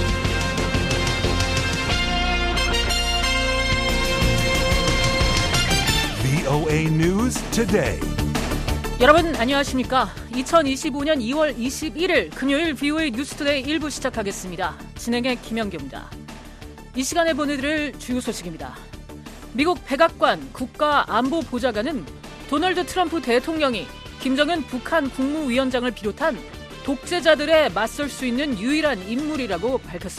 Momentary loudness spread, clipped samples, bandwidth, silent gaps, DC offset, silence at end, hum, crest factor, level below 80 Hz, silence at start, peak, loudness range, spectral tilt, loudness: 11 LU; under 0.1%; 15 kHz; none; under 0.1%; 0 s; none; 22 dB; -32 dBFS; 0 s; 0 dBFS; 6 LU; -4.5 dB/octave; -21 LUFS